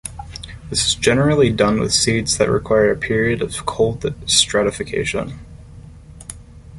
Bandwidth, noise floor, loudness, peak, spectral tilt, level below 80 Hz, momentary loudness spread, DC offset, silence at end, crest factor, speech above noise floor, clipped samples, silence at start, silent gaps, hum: 11.5 kHz; -39 dBFS; -17 LUFS; 0 dBFS; -3.5 dB/octave; -38 dBFS; 18 LU; under 0.1%; 0 s; 18 dB; 22 dB; under 0.1%; 0.05 s; none; none